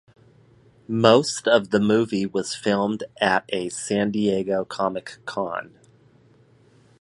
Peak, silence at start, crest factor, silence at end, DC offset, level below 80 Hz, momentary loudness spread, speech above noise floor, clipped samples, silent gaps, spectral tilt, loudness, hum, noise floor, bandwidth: 0 dBFS; 0.9 s; 22 dB; 1.35 s; under 0.1%; -62 dBFS; 12 LU; 34 dB; under 0.1%; none; -4.5 dB/octave; -22 LUFS; none; -56 dBFS; 11.5 kHz